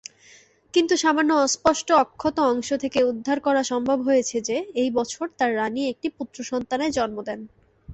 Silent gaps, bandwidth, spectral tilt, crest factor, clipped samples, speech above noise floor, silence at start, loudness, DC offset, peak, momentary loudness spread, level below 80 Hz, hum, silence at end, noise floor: none; 8.2 kHz; -3 dB/octave; 18 dB; under 0.1%; 31 dB; 0.75 s; -23 LUFS; under 0.1%; -4 dBFS; 10 LU; -58 dBFS; none; 0 s; -53 dBFS